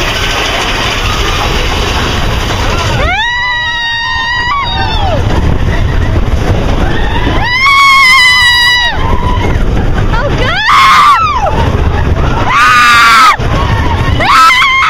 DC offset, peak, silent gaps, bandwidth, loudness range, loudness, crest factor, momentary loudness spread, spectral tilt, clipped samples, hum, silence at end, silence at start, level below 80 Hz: under 0.1%; 0 dBFS; none; 16.5 kHz; 5 LU; -8 LUFS; 8 dB; 9 LU; -4 dB/octave; 2%; none; 0 s; 0 s; -16 dBFS